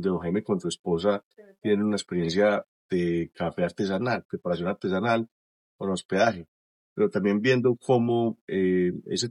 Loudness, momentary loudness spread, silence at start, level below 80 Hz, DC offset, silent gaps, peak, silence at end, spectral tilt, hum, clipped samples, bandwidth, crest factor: -26 LUFS; 8 LU; 0 s; -62 dBFS; under 0.1%; 0.79-0.84 s, 1.23-1.31 s, 2.68-2.89 s, 4.25-4.29 s, 5.31-5.79 s, 6.05-6.09 s, 6.48-6.96 s, 8.41-8.48 s; -8 dBFS; 0 s; -6 dB/octave; none; under 0.1%; 11.5 kHz; 18 dB